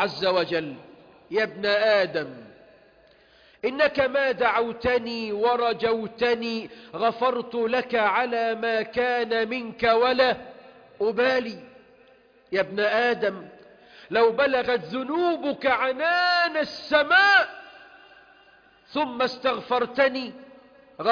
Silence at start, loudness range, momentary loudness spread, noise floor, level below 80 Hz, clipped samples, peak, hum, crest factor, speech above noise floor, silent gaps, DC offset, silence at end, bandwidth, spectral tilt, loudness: 0 s; 5 LU; 10 LU; -56 dBFS; -60 dBFS; under 0.1%; -6 dBFS; none; 18 dB; 33 dB; none; under 0.1%; 0 s; 5.2 kHz; -5 dB/octave; -23 LUFS